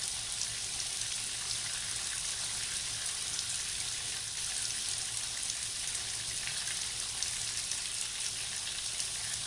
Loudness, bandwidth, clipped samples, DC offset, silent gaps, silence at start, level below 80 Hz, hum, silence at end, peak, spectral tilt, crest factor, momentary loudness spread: -33 LUFS; 11.5 kHz; under 0.1%; under 0.1%; none; 0 s; -60 dBFS; none; 0 s; -14 dBFS; 1 dB/octave; 22 dB; 1 LU